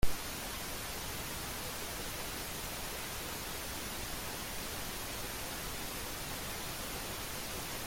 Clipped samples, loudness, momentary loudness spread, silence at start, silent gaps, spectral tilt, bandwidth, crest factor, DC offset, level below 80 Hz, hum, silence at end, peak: under 0.1%; -39 LUFS; 0 LU; 0 s; none; -2.5 dB/octave; 17 kHz; 22 dB; under 0.1%; -48 dBFS; none; 0 s; -16 dBFS